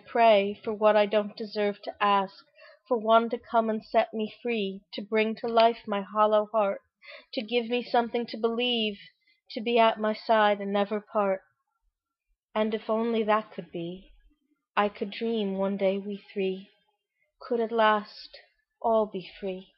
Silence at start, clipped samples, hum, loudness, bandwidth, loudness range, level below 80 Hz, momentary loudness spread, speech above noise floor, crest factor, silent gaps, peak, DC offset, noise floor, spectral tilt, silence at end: 0.1 s; under 0.1%; none; -27 LUFS; 5.8 kHz; 5 LU; -70 dBFS; 14 LU; 52 dB; 20 dB; 12.43-12.48 s, 14.70-14.74 s; -8 dBFS; under 0.1%; -79 dBFS; -8.5 dB/octave; 0.15 s